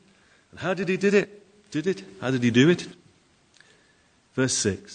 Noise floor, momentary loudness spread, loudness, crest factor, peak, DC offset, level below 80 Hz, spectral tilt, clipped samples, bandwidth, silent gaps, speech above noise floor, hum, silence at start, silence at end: -62 dBFS; 14 LU; -24 LUFS; 20 dB; -6 dBFS; under 0.1%; -66 dBFS; -4.5 dB/octave; under 0.1%; 9.6 kHz; none; 38 dB; none; 0.55 s; 0 s